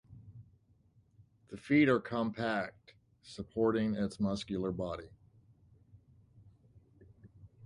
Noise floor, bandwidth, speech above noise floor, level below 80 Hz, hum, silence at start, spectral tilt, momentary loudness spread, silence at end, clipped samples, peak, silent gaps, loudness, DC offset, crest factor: -68 dBFS; 11 kHz; 35 dB; -62 dBFS; none; 0.1 s; -7 dB/octave; 24 LU; 0 s; under 0.1%; -16 dBFS; none; -33 LUFS; under 0.1%; 20 dB